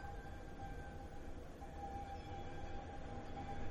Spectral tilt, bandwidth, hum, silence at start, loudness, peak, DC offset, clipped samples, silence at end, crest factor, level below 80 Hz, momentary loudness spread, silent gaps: -6.5 dB/octave; 12 kHz; none; 0 s; -51 LUFS; -32 dBFS; under 0.1%; under 0.1%; 0 s; 14 dB; -52 dBFS; 4 LU; none